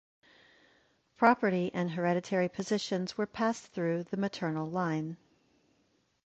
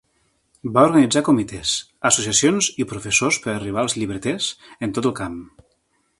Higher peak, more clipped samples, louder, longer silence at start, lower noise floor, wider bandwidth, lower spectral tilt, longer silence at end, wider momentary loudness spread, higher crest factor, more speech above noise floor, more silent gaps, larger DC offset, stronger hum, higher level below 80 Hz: second, -10 dBFS vs 0 dBFS; neither; second, -32 LUFS vs -19 LUFS; first, 1.2 s vs 0.65 s; first, -73 dBFS vs -67 dBFS; second, 8.4 kHz vs 11.5 kHz; first, -6 dB/octave vs -3.5 dB/octave; first, 1.1 s vs 0.75 s; second, 8 LU vs 12 LU; about the same, 24 dB vs 20 dB; second, 42 dB vs 47 dB; neither; neither; neither; second, -72 dBFS vs -52 dBFS